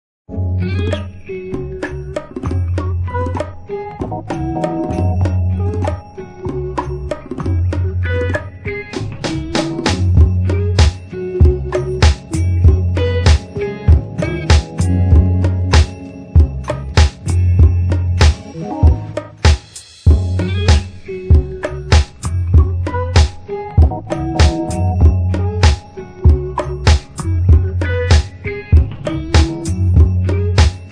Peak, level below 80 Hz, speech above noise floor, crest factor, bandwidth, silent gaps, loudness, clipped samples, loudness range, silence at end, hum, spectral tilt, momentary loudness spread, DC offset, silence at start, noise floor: 0 dBFS; -18 dBFS; 17 dB; 14 dB; 10.5 kHz; none; -16 LUFS; under 0.1%; 6 LU; 0 s; none; -6.5 dB/octave; 12 LU; under 0.1%; 0.3 s; -36 dBFS